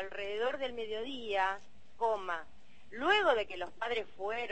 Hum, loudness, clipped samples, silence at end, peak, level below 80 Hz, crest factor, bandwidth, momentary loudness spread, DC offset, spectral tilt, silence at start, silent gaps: none; -34 LUFS; under 0.1%; 0 s; -16 dBFS; -66 dBFS; 18 dB; 8.4 kHz; 12 LU; 0.5%; -3.5 dB/octave; 0 s; none